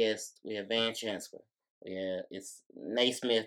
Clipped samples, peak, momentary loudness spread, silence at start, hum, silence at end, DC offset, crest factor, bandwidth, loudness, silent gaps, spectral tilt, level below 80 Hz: under 0.1%; -14 dBFS; 17 LU; 0 s; none; 0 s; under 0.1%; 20 dB; 17 kHz; -34 LUFS; 1.70-1.81 s, 2.66-2.70 s; -2.5 dB/octave; -84 dBFS